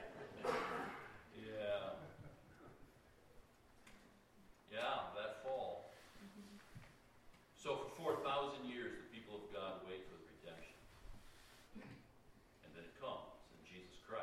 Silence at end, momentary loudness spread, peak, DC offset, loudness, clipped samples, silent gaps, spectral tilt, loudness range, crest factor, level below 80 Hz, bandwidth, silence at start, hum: 0 s; 25 LU; -28 dBFS; under 0.1%; -47 LUFS; under 0.1%; none; -4.5 dB/octave; 10 LU; 22 dB; -70 dBFS; 16 kHz; 0 s; none